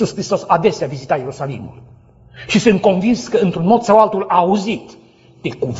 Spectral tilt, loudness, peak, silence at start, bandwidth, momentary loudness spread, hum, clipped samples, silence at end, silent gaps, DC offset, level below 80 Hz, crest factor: -6 dB/octave; -16 LUFS; 0 dBFS; 0 s; 8 kHz; 15 LU; none; under 0.1%; 0 s; none; under 0.1%; -50 dBFS; 16 dB